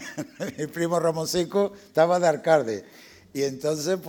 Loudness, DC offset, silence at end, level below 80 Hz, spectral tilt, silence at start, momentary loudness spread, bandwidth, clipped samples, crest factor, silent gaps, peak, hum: -25 LUFS; under 0.1%; 0 s; -64 dBFS; -5 dB/octave; 0 s; 13 LU; 19.5 kHz; under 0.1%; 20 dB; none; -6 dBFS; none